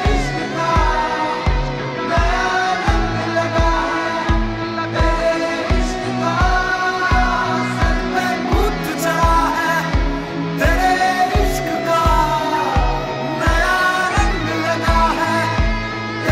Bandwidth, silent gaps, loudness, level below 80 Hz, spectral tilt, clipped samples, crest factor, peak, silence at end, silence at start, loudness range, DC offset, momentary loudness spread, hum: 15.5 kHz; none; -18 LUFS; -22 dBFS; -5 dB/octave; under 0.1%; 12 dB; -4 dBFS; 0 s; 0 s; 1 LU; under 0.1%; 5 LU; none